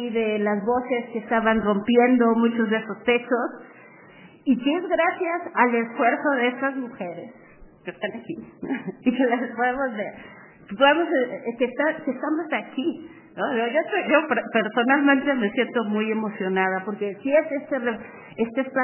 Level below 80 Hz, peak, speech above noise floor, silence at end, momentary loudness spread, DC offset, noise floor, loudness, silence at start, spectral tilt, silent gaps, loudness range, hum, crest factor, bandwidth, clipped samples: -62 dBFS; -4 dBFS; 25 dB; 0 s; 14 LU; under 0.1%; -48 dBFS; -23 LUFS; 0 s; -9 dB/octave; none; 5 LU; none; 20 dB; 3.2 kHz; under 0.1%